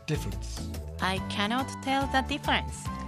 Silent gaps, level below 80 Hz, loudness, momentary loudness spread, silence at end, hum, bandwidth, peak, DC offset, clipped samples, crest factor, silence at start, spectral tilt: none; -40 dBFS; -30 LUFS; 10 LU; 0 s; none; 15.5 kHz; -10 dBFS; under 0.1%; under 0.1%; 20 dB; 0 s; -4.5 dB/octave